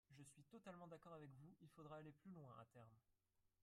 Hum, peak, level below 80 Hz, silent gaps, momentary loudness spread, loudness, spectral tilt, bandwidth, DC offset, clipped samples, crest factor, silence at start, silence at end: none; -44 dBFS; -90 dBFS; none; 7 LU; -63 LUFS; -6.5 dB/octave; 13 kHz; under 0.1%; under 0.1%; 18 dB; 0.1 s; 0 s